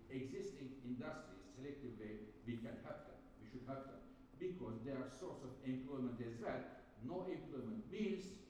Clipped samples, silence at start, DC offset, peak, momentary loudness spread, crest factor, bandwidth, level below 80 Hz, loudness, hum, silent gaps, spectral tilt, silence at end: under 0.1%; 0 s; under 0.1%; -32 dBFS; 10 LU; 18 dB; 11.5 kHz; -70 dBFS; -50 LUFS; none; none; -7 dB/octave; 0 s